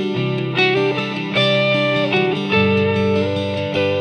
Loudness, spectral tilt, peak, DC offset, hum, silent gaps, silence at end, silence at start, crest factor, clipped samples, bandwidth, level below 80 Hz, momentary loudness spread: -17 LUFS; -6.5 dB/octave; -4 dBFS; under 0.1%; none; none; 0 s; 0 s; 14 dB; under 0.1%; 10 kHz; -58 dBFS; 6 LU